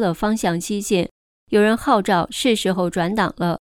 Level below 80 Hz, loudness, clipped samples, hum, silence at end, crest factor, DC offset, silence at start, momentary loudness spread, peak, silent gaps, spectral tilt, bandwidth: -46 dBFS; -20 LUFS; under 0.1%; none; 0.15 s; 16 dB; under 0.1%; 0 s; 5 LU; -4 dBFS; 1.11-1.47 s; -5 dB/octave; 18 kHz